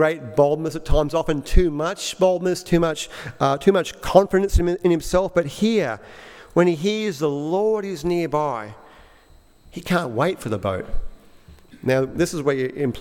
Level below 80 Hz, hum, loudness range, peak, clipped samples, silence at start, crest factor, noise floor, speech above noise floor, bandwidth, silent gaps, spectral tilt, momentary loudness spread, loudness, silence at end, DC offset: -30 dBFS; none; 6 LU; 0 dBFS; under 0.1%; 0 s; 20 dB; -51 dBFS; 31 dB; 16.5 kHz; none; -6 dB/octave; 10 LU; -21 LUFS; 0 s; under 0.1%